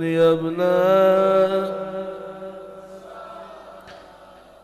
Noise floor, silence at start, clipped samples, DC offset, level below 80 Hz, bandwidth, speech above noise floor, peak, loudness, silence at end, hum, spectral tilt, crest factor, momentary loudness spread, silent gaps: -46 dBFS; 0 s; under 0.1%; under 0.1%; -60 dBFS; 13 kHz; 28 dB; -6 dBFS; -19 LUFS; 0.65 s; none; -7 dB/octave; 16 dB; 24 LU; none